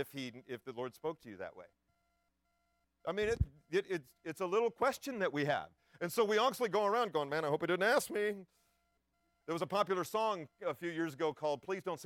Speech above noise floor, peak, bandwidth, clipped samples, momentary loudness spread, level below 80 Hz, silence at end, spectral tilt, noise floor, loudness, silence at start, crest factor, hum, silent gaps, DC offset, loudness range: 45 dB; -18 dBFS; 17 kHz; under 0.1%; 14 LU; -58 dBFS; 0 s; -4.5 dB/octave; -81 dBFS; -36 LUFS; 0 s; 18 dB; none; none; under 0.1%; 7 LU